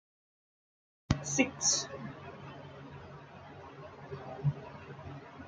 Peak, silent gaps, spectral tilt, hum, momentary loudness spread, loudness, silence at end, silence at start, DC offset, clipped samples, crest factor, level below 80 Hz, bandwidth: -10 dBFS; none; -3.5 dB/octave; none; 21 LU; -33 LUFS; 0 s; 1.1 s; under 0.1%; under 0.1%; 28 dB; -56 dBFS; 10 kHz